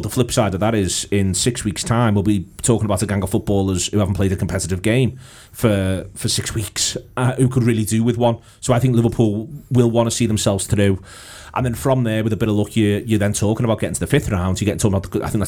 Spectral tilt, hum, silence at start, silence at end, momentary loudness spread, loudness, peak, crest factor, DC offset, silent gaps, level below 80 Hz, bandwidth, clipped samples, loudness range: -5.5 dB/octave; none; 0 s; 0 s; 6 LU; -19 LUFS; -2 dBFS; 16 dB; 0.3%; none; -40 dBFS; 17.5 kHz; under 0.1%; 2 LU